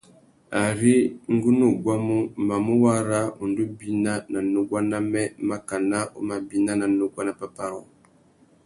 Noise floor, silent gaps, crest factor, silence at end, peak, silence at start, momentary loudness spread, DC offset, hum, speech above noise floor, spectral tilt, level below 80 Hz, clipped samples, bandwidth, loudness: -57 dBFS; none; 18 dB; 0.8 s; -6 dBFS; 0.5 s; 10 LU; under 0.1%; none; 34 dB; -6 dB/octave; -60 dBFS; under 0.1%; 11.5 kHz; -24 LUFS